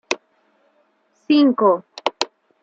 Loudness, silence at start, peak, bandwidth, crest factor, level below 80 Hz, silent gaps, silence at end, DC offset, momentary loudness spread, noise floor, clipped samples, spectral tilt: -19 LUFS; 0.1 s; 0 dBFS; 7.8 kHz; 20 dB; -74 dBFS; none; 0.4 s; under 0.1%; 12 LU; -63 dBFS; under 0.1%; -4 dB/octave